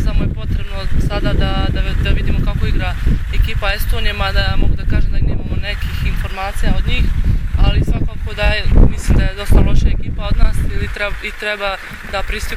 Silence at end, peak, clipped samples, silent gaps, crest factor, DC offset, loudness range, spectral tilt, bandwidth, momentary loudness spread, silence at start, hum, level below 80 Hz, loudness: 0 s; 0 dBFS; under 0.1%; none; 14 dB; under 0.1%; 3 LU; -6 dB/octave; 15 kHz; 7 LU; 0 s; none; -16 dBFS; -18 LUFS